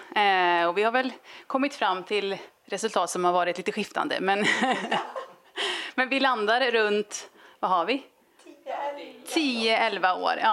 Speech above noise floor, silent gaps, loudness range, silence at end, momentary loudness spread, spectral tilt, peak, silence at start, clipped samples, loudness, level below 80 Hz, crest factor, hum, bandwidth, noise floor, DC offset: 28 dB; none; 2 LU; 0 s; 13 LU; -3 dB/octave; -8 dBFS; 0 s; under 0.1%; -25 LUFS; -82 dBFS; 18 dB; none; 14 kHz; -53 dBFS; under 0.1%